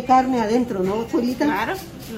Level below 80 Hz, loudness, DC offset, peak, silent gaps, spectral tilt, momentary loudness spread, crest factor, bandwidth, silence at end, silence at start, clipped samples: -48 dBFS; -21 LUFS; under 0.1%; -4 dBFS; none; -5.5 dB/octave; 7 LU; 16 dB; 16 kHz; 0 s; 0 s; under 0.1%